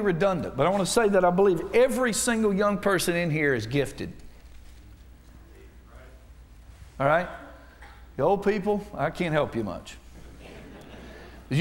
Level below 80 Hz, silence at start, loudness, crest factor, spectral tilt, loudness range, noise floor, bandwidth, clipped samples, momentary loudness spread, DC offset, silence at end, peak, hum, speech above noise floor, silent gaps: -48 dBFS; 0 s; -25 LUFS; 18 dB; -5 dB/octave; 10 LU; -49 dBFS; 16 kHz; under 0.1%; 23 LU; under 0.1%; 0 s; -8 dBFS; none; 25 dB; none